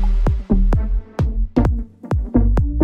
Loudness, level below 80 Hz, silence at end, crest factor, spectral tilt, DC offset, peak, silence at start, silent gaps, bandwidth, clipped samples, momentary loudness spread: -20 LUFS; -18 dBFS; 0 s; 16 dB; -9.5 dB/octave; under 0.1%; -2 dBFS; 0 s; none; 5.4 kHz; under 0.1%; 7 LU